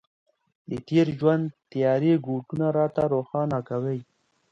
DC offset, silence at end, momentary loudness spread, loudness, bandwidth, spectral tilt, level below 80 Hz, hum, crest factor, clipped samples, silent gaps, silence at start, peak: under 0.1%; 0.5 s; 10 LU; -25 LUFS; 7.6 kHz; -9 dB/octave; -62 dBFS; none; 18 dB; under 0.1%; none; 0.7 s; -8 dBFS